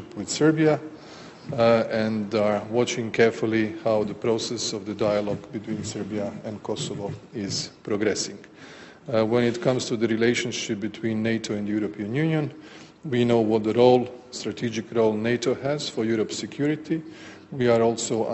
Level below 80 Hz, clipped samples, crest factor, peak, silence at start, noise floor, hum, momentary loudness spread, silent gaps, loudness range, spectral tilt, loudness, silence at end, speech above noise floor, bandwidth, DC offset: -62 dBFS; under 0.1%; 20 dB; -4 dBFS; 0 s; -44 dBFS; none; 13 LU; none; 6 LU; -5 dB/octave; -25 LUFS; 0 s; 19 dB; 8.2 kHz; under 0.1%